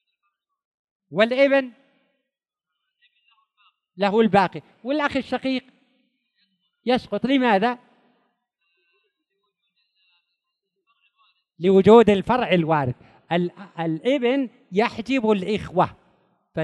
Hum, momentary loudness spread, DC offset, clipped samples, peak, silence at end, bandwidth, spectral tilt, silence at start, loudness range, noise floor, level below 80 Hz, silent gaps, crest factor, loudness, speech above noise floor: none; 13 LU; under 0.1%; under 0.1%; -2 dBFS; 0 s; 10 kHz; -7 dB/octave; 1.1 s; 6 LU; -84 dBFS; -58 dBFS; none; 22 dB; -21 LUFS; 64 dB